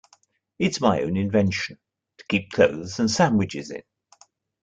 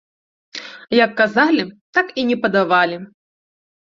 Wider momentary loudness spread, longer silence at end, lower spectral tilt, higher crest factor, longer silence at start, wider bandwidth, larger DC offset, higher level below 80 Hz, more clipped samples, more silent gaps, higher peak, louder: second, 13 LU vs 17 LU; about the same, 0.85 s vs 0.9 s; about the same, -5.5 dB/octave vs -5.5 dB/octave; about the same, 20 dB vs 18 dB; about the same, 0.6 s vs 0.55 s; first, 9.2 kHz vs 7.6 kHz; neither; first, -58 dBFS vs -64 dBFS; neither; second, none vs 1.81-1.93 s; about the same, -4 dBFS vs -2 dBFS; second, -23 LUFS vs -17 LUFS